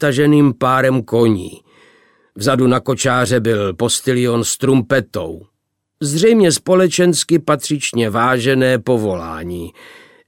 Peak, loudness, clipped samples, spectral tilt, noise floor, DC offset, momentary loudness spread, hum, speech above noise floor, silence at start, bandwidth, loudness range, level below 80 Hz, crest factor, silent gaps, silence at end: -2 dBFS; -15 LUFS; under 0.1%; -5 dB/octave; -72 dBFS; under 0.1%; 13 LU; none; 57 dB; 0 s; 17 kHz; 3 LU; -50 dBFS; 14 dB; none; 0.4 s